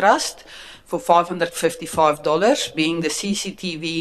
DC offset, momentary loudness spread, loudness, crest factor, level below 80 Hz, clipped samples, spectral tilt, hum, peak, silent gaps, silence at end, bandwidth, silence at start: under 0.1%; 10 LU; -20 LUFS; 20 dB; -56 dBFS; under 0.1%; -3.5 dB/octave; none; -2 dBFS; none; 0 s; 13.5 kHz; 0 s